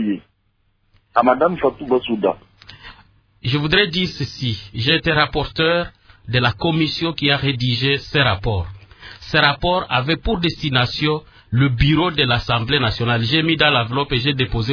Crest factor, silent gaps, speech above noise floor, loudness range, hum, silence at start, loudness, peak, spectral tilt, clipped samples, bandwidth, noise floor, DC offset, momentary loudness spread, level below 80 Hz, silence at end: 20 dB; none; 46 dB; 4 LU; none; 0 s; -18 LUFS; 0 dBFS; -6.5 dB/octave; under 0.1%; 5.4 kHz; -64 dBFS; under 0.1%; 9 LU; -36 dBFS; 0 s